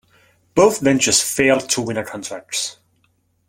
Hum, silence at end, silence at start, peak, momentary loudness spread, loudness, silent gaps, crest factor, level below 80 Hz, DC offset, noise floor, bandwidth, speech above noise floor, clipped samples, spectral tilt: none; 0.75 s; 0.55 s; 0 dBFS; 12 LU; -17 LUFS; none; 18 dB; -54 dBFS; under 0.1%; -63 dBFS; 16.5 kHz; 46 dB; under 0.1%; -3 dB/octave